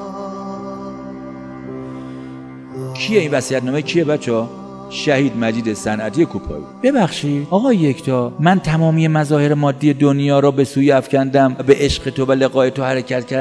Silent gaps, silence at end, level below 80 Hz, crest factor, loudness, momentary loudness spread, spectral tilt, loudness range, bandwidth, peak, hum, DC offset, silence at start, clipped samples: none; 0 s; -44 dBFS; 16 dB; -16 LUFS; 16 LU; -6.5 dB/octave; 7 LU; 11 kHz; 0 dBFS; none; under 0.1%; 0 s; under 0.1%